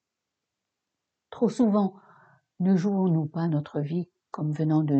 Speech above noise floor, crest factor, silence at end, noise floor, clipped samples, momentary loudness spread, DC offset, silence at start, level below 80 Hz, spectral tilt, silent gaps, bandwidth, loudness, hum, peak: 61 dB; 16 dB; 0 s; -85 dBFS; under 0.1%; 8 LU; under 0.1%; 1.3 s; -74 dBFS; -9 dB/octave; none; 8.6 kHz; -26 LUFS; none; -10 dBFS